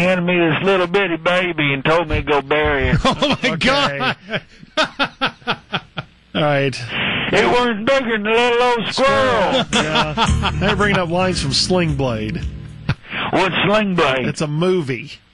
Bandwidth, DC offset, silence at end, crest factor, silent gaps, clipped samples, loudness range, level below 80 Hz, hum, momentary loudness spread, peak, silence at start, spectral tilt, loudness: 11.5 kHz; under 0.1%; 0.2 s; 14 dB; none; under 0.1%; 4 LU; -34 dBFS; none; 10 LU; -4 dBFS; 0 s; -5 dB/octave; -17 LUFS